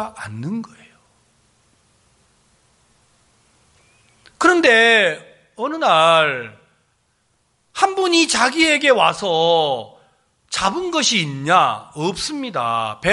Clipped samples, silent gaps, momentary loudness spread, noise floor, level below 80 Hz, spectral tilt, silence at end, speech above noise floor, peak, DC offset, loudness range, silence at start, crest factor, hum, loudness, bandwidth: under 0.1%; none; 15 LU; -64 dBFS; -56 dBFS; -3 dB/octave; 0 s; 47 dB; 0 dBFS; under 0.1%; 4 LU; 0 s; 18 dB; none; -16 LUFS; 11.5 kHz